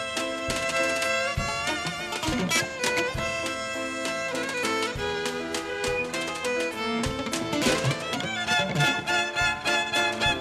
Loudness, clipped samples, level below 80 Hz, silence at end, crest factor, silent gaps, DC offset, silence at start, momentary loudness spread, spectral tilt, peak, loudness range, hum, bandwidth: -26 LUFS; under 0.1%; -48 dBFS; 0 s; 18 dB; none; under 0.1%; 0 s; 6 LU; -3 dB/octave; -10 dBFS; 3 LU; none; 13.5 kHz